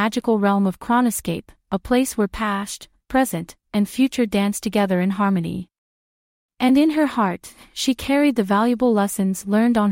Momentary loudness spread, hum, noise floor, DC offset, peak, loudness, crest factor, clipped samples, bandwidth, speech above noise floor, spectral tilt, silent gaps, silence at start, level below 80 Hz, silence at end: 11 LU; none; under -90 dBFS; under 0.1%; -6 dBFS; -20 LUFS; 14 dB; under 0.1%; 16.5 kHz; over 70 dB; -5.5 dB/octave; 5.78-6.49 s; 0 s; -48 dBFS; 0 s